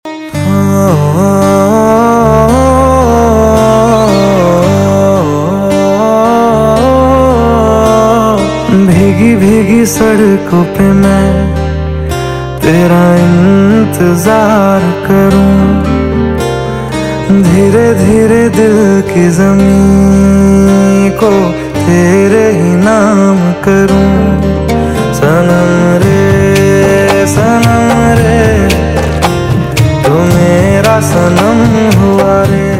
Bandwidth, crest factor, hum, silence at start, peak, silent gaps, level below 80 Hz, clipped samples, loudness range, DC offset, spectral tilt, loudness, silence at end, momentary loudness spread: 16 kHz; 6 dB; none; 0.05 s; 0 dBFS; none; -22 dBFS; 1%; 2 LU; under 0.1%; -6.5 dB/octave; -7 LUFS; 0 s; 5 LU